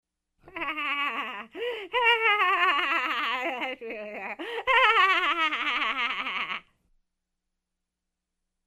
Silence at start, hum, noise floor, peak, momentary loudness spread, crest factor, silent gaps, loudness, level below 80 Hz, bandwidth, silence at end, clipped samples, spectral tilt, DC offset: 0.45 s; none; -85 dBFS; -8 dBFS; 15 LU; 20 dB; none; -25 LUFS; -64 dBFS; 15 kHz; 2.05 s; under 0.1%; -1.5 dB/octave; under 0.1%